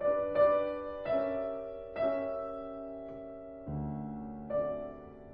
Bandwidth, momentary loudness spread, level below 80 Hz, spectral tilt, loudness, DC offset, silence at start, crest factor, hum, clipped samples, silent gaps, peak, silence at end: 5 kHz; 17 LU; -58 dBFS; -10 dB/octave; -35 LUFS; under 0.1%; 0 s; 18 dB; none; under 0.1%; none; -16 dBFS; 0 s